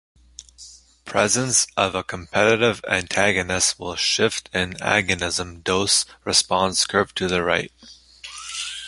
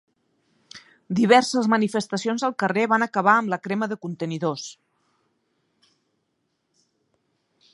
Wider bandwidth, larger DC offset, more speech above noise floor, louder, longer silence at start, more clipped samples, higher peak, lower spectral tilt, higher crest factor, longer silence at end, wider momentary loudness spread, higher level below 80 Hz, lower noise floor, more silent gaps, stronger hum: about the same, 11.5 kHz vs 11.5 kHz; neither; second, 25 dB vs 52 dB; about the same, -20 LUFS vs -22 LUFS; second, 0.6 s vs 0.75 s; neither; about the same, -2 dBFS vs -4 dBFS; second, -2 dB/octave vs -5 dB/octave; about the same, 22 dB vs 22 dB; second, 0 s vs 3 s; about the same, 11 LU vs 12 LU; first, -48 dBFS vs -74 dBFS; second, -46 dBFS vs -74 dBFS; neither; neither